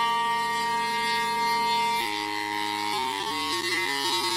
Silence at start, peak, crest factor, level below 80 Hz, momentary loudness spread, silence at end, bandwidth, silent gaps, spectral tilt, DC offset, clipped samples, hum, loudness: 0 s; -14 dBFS; 14 dB; -64 dBFS; 4 LU; 0 s; 16 kHz; none; -1.5 dB/octave; under 0.1%; under 0.1%; none; -26 LUFS